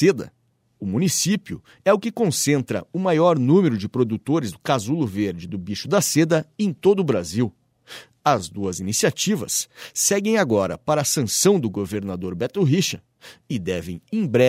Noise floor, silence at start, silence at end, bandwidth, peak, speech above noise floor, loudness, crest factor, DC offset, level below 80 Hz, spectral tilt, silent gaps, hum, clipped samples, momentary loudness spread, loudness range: -44 dBFS; 0 s; 0 s; 16 kHz; -4 dBFS; 23 dB; -21 LUFS; 18 dB; under 0.1%; -58 dBFS; -4.5 dB/octave; none; none; under 0.1%; 11 LU; 2 LU